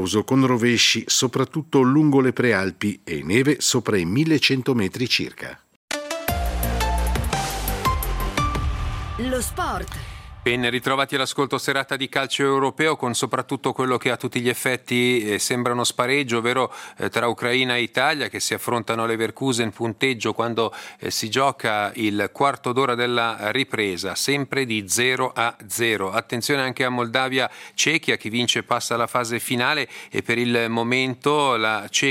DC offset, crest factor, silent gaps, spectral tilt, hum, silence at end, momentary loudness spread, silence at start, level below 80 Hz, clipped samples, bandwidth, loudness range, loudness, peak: under 0.1%; 20 dB; 5.76-5.88 s; -3.5 dB/octave; none; 0 s; 7 LU; 0 s; -36 dBFS; under 0.1%; 16 kHz; 5 LU; -22 LUFS; -2 dBFS